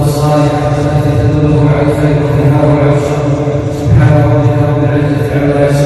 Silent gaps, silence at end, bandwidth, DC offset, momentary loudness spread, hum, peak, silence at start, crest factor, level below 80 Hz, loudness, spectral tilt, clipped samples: none; 0 s; 12.5 kHz; under 0.1%; 4 LU; none; 0 dBFS; 0 s; 8 dB; -26 dBFS; -10 LUFS; -8 dB/octave; 0.6%